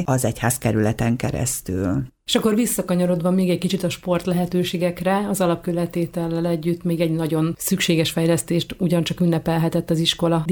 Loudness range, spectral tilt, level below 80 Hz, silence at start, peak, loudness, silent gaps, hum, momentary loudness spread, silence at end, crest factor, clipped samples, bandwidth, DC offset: 2 LU; -5.5 dB/octave; -46 dBFS; 0 s; -4 dBFS; -21 LUFS; none; none; 4 LU; 0 s; 18 dB; under 0.1%; 20 kHz; under 0.1%